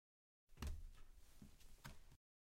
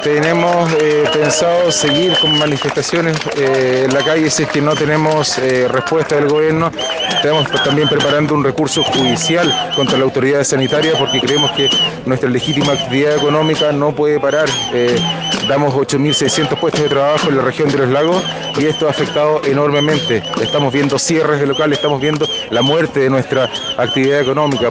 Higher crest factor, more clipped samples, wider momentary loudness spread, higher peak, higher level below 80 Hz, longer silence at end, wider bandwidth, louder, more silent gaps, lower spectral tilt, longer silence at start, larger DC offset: first, 22 dB vs 14 dB; neither; first, 14 LU vs 3 LU; second, -36 dBFS vs 0 dBFS; second, -60 dBFS vs -48 dBFS; first, 0.35 s vs 0 s; first, 16 kHz vs 10 kHz; second, -59 LUFS vs -13 LUFS; neither; about the same, -4.5 dB/octave vs -4 dB/octave; first, 0.5 s vs 0 s; neither